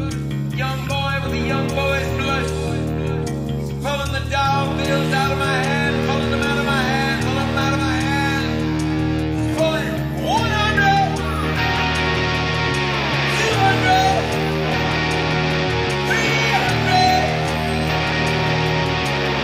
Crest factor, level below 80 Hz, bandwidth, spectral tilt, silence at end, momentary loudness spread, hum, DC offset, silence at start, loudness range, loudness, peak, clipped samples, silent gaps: 18 dB; -34 dBFS; 15.5 kHz; -5 dB/octave; 0 s; 7 LU; none; under 0.1%; 0 s; 4 LU; -19 LUFS; -2 dBFS; under 0.1%; none